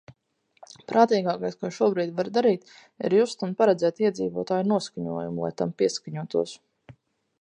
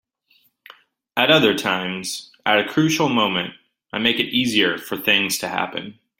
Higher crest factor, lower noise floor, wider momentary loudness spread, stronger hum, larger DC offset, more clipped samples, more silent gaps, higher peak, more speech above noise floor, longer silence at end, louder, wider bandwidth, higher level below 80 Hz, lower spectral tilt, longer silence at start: about the same, 22 dB vs 20 dB; first, -70 dBFS vs -62 dBFS; about the same, 10 LU vs 12 LU; neither; neither; neither; neither; about the same, -4 dBFS vs -2 dBFS; about the same, 45 dB vs 42 dB; first, 0.5 s vs 0.25 s; second, -25 LUFS vs -19 LUFS; second, 10.5 kHz vs 16.5 kHz; second, -68 dBFS vs -62 dBFS; first, -6 dB/octave vs -3.5 dB/octave; second, 0.9 s vs 1.15 s